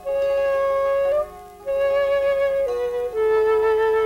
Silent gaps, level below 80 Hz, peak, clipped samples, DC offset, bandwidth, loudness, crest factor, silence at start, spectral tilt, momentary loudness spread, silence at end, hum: none; -48 dBFS; -12 dBFS; under 0.1%; under 0.1%; 15.5 kHz; -21 LUFS; 10 dB; 0 s; -4 dB/octave; 6 LU; 0 s; 50 Hz at -50 dBFS